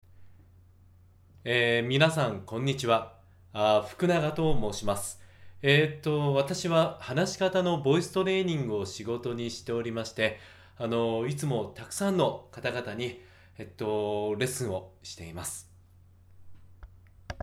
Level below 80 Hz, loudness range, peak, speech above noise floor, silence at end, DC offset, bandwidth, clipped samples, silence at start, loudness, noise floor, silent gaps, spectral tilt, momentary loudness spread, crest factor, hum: -52 dBFS; 7 LU; -10 dBFS; 29 dB; 0 s; under 0.1%; 15.5 kHz; under 0.1%; 0.2 s; -29 LUFS; -57 dBFS; none; -5 dB/octave; 13 LU; 20 dB; none